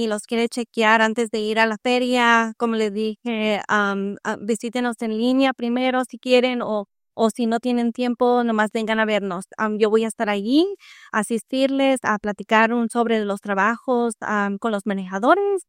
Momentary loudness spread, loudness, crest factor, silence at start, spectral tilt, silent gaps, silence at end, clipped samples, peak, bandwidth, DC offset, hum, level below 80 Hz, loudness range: 8 LU; -21 LUFS; 18 dB; 0 s; -4.5 dB/octave; none; 0.05 s; under 0.1%; -2 dBFS; 15 kHz; under 0.1%; none; -68 dBFS; 2 LU